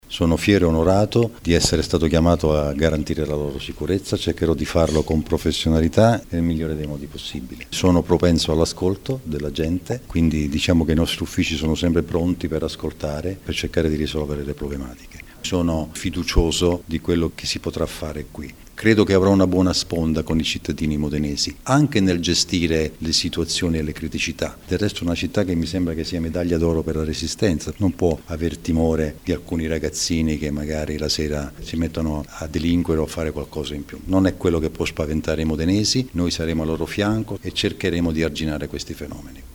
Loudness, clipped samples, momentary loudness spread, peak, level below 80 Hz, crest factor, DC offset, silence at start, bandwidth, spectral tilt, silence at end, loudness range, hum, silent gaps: -21 LUFS; under 0.1%; 11 LU; 0 dBFS; -34 dBFS; 20 dB; under 0.1%; 0.1 s; over 20 kHz; -5.5 dB/octave; 0 s; 4 LU; none; none